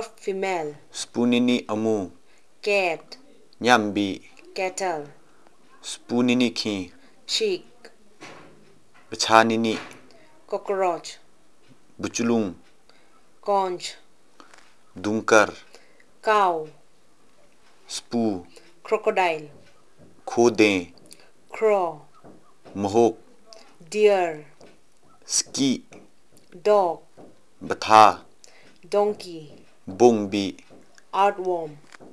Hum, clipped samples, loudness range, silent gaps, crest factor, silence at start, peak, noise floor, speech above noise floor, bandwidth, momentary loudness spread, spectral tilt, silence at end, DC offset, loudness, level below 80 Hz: none; under 0.1%; 7 LU; none; 24 dB; 0 s; 0 dBFS; -60 dBFS; 38 dB; 12 kHz; 20 LU; -3.5 dB/octave; 0.35 s; 0.4%; -23 LUFS; -70 dBFS